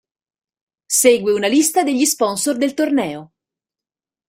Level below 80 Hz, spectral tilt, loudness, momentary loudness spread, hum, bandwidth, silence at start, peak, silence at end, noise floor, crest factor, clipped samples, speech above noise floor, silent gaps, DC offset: -64 dBFS; -2.5 dB/octave; -16 LUFS; 6 LU; none; 16 kHz; 0.9 s; -2 dBFS; 1.05 s; -90 dBFS; 18 dB; under 0.1%; 73 dB; none; under 0.1%